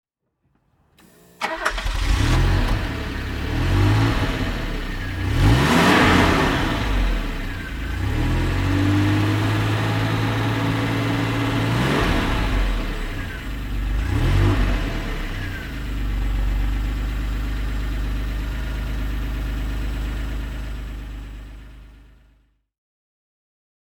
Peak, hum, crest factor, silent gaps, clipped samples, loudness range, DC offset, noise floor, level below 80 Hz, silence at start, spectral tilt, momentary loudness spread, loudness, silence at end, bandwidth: -2 dBFS; none; 18 dB; none; under 0.1%; 11 LU; under 0.1%; -70 dBFS; -26 dBFS; 1.4 s; -6 dB/octave; 12 LU; -22 LUFS; 1.85 s; 17 kHz